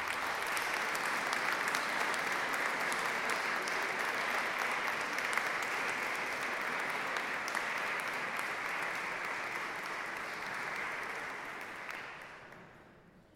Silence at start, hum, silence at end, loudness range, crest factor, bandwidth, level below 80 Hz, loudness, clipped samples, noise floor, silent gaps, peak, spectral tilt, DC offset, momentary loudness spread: 0 s; none; 0.15 s; 6 LU; 24 dB; 16.5 kHz; -72 dBFS; -35 LUFS; under 0.1%; -60 dBFS; none; -12 dBFS; -1.5 dB/octave; under 0.1%; 9 LU